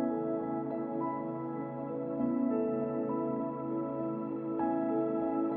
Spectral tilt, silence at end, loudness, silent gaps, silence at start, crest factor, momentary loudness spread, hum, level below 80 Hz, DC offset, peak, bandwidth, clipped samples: -10 dB/octave; 0 s; -34 LUFS; none; 0 s; 12 dB; 6 LU; none; -72 dBFS; under 0.1%; -20 dBFS; 3.5 kHz; under 0.1%